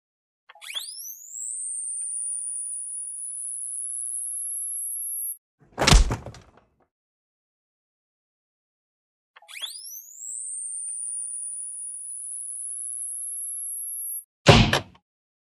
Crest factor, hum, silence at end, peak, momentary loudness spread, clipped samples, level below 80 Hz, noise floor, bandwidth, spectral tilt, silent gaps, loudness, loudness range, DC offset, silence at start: 28 dB; none; 0.5 s; 0 dBFS; 16 LU; under 0.1%; -34 dBFS; -59 dBFS; 15.5 kHz; -3 dB/octave; 5.38-5.58 s, 6.91-9.34 s, 14.25-14.45 s; -26 LUFS; 13 LU; under 0.1%; 0.55 s